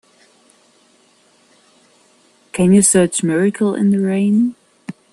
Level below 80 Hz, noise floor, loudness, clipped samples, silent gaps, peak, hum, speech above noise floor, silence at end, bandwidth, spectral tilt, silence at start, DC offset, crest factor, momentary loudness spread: -56 dBFS; -54 dBFS; -15 LUFS; under 0.1%; none; 0 dBFS; none; 40 dB; 0.2 s; 12.5 kHz; -5.5 dB/octave; 2.55 s; under 0.1%; 16 dB; 21 LU